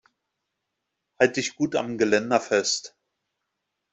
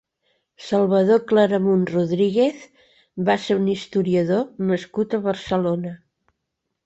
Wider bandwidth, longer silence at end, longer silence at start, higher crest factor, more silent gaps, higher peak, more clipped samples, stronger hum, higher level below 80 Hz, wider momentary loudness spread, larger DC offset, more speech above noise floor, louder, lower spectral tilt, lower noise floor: about the same, 8.2 kHz vs 8 kHz; first, 1.05 s vs 0.9 s; first, 1.2 s vs 0.6 s; first, 24 dB vs 16 dB; neither; about the same, -4 dBFS vs -6 dBFS; neither; neither; second, -68 dBFS vs -60 dBFS; second, 4 LU vs 8 LU; neither; about the same, 58 dB vs 59 dB; second, -24 LUFS vs -21 LUFS; second, -3 dB/octave vs -7.5 dB/octave; about the same, -81 dBFS vs -79 dBFS